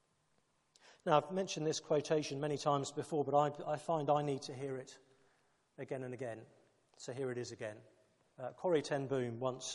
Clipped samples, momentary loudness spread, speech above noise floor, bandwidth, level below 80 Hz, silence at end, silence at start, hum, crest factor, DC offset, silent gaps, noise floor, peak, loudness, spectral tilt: under 0.1%; 14 LU; 40 dB; 11.5 kHz; -82 dBFS; 0 s; 0.85 s; none; 22 dB; under 0.1%; none; -77 dBFS; -16 dBFS; -38 LUFS; -5 dB/octave